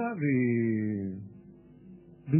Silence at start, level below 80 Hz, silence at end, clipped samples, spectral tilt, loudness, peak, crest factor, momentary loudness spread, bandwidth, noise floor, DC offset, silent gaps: 0 s; -64 dBFS; 0 s; under 0.1%; -12 dB/octave; -29 LUFS; -12 dBFS; 18 dB; 20 LU; 2.9 kHz; -53 dBFS; under 0.1%; none